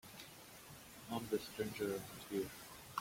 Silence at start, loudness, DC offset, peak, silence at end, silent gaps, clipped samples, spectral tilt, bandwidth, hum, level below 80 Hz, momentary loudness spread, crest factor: 0.05 s; -45 LUFS; under 0.1%; -24 dBFS; 0 s; none; under 0.1%; -4.5 dB/octave; 16.5 kHz; none; -72 dBFS; 14 LU; 20 dB